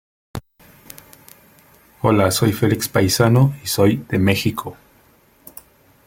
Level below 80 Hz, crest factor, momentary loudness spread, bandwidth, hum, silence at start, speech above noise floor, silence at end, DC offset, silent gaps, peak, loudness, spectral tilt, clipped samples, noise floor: -50 dBFS; 18 dB; 25 LU; 17 kHz; none; 0.35 s; 37 dB; 1.35 s; under 0.1%; none; -2 dBFS; -17 LUFS; -5.5 dB/octave; under 0.1%; -54 dBFS